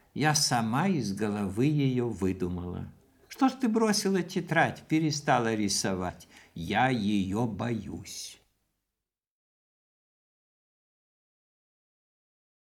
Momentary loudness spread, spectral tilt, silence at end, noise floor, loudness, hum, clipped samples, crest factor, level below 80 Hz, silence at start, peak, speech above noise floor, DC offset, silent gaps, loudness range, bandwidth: 14 LU; -4.5 dB/octave; 4.45 s; -89 dBFS; -28 LUFS; none; under 0.1%; 22 dB; -64 dBFS; 0.15 s; -10 dBFS; 61 dB; under 0.1%; none; 10 LU; 18 kHz